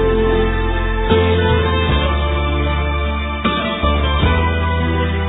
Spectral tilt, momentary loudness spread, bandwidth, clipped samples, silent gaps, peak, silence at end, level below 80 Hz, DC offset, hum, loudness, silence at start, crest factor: -10 dB/octave; 5 LU; 4 kHz; under 0.1%; none; 0 dBFS; 0 s; -20 dBFS; under 0.1%; none; -17 LUFS; 0 s; 16 dB